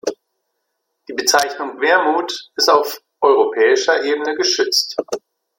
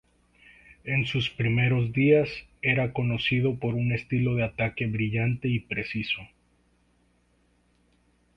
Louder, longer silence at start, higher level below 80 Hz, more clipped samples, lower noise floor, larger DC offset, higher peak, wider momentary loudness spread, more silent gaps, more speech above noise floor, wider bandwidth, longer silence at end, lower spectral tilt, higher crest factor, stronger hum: first, -16 LUFS vs -26 LUFS; second, 0.05 s vs 0.85 s; second, -66 dBFS vs -54 dBFS; neither; first, -73 dBFS vs -66 dBFS; neither; first, -2 dBFS vs -8 dBFS; first, 11 LU vs 7 LU; neither; first, 57 dB vs 41 dB; first, 16.5 kHz vs 7 kHz; second, 0.4 s vs 2.1 s; second, -0.5 dB/octave vs -8 dB/octave; about the same, 16 dB vs 18 dB; second, none vs 60 Hz at -45 dBFS